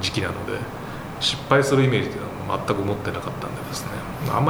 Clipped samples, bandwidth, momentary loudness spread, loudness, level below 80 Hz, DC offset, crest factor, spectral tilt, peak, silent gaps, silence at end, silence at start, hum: under 0.1%; over 20 kHz; 12 LU; -24 LUFS; -46 dBFS; under 0.1%; 22 dB; -5 dB/octave; -2 dBFS; none; 0 s; 0 s; none